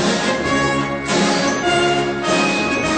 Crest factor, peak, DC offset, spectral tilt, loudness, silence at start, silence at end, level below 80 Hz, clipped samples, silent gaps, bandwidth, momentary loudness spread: 12 dB; -4 dBFS; 0.2%; -4 dB/octave; -17 LUFS; 0 s; 0 s; -42 dBFS; under 0.1%; none; 9.2 kHz; 3 LU